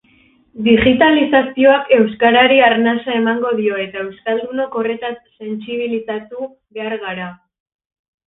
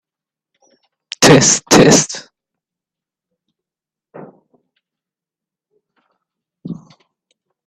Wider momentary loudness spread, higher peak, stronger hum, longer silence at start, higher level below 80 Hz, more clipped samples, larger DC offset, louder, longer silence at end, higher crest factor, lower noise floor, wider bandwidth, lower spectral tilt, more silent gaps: second, 17 LU vs 24 LU; about the same, 0 dBFS vs 0 dBFS; neither; second, 0.55 s vs 1.2 s; about the same, -46 dBFS vs -48 dBFS; neither; neither; second, -15 LUFS vs -9 LUFS; about the same, 0.95 s vs 0.95 s; about the same, 16 dB vs 18 dB; second, -53 dBFS vs -88 dBFS; second, 4 kHz vs 16 kHz; first, -9 dB/octave vs -3.5 dB/octave; neither